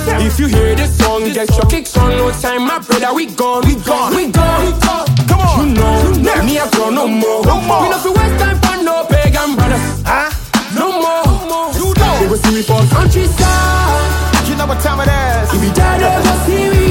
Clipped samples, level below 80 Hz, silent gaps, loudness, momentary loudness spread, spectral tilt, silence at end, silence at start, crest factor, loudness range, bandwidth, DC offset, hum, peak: under 0.1%; -18 dBFS; none; -12 LUFS; 4 LU; -5 dB/octave; 0 s; 0 s; 12 dB; 1 LU; 17 kHz; under 0.1%; none; 0 dBFS